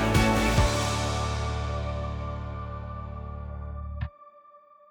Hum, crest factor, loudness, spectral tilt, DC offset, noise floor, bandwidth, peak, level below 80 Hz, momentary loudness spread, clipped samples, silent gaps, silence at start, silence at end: none; 18 dB; -29 LUFS; -5 dB/octave; under 0.1%; -54 dBFS; 19.5 kHz; -12 dBFS; -34 dBFS; 15 LU; under 0.1%; none; 0 s; 0.35 s